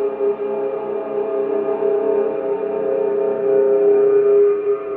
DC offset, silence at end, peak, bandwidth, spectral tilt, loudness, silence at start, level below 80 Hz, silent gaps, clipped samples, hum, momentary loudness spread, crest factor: under 0.1%; 0 s; -6 dBFS; 3.1 kHz; -10.5 dB/octave; -18 LUFS; 0 s; -64 dBFS; none; under 0.1%; none; 9 LU; 12 dB